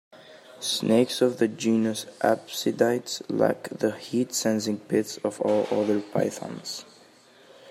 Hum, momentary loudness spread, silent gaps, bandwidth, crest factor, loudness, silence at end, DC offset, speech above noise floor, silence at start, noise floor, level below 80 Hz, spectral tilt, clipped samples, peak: none; 8 LU; none; 16 kHz; 20 dB; -26 LUFS; 0 s; under 0.1%; 29 dB; 0.15 s; -54 dBFS; -74 dBFS; -4.5 dB/octave; under 0.1%; -6 dBFS